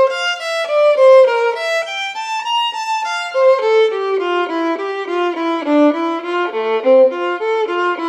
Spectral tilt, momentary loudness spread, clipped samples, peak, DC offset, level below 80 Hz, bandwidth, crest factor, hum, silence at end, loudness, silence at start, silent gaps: -2 dB/octave; 9 LU; under 0.1%; -2 dBFS; under 0.1%; -80 dBFS; 9.8 kHz; 14 dB; none; 0 s; -15 LUFS; 0 s; none